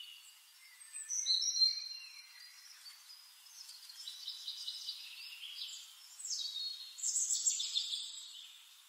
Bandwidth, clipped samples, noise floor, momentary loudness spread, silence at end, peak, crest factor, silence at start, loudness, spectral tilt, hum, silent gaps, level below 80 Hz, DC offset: 16.5 kHz; under 0.1%; -60 dBFS; 22 LU; 0 s; -18 dBFS; 22 dB; 0 s; -36 LUFS; 10.5 dB/octave; none; none; under -90 dBFS; under 0.1%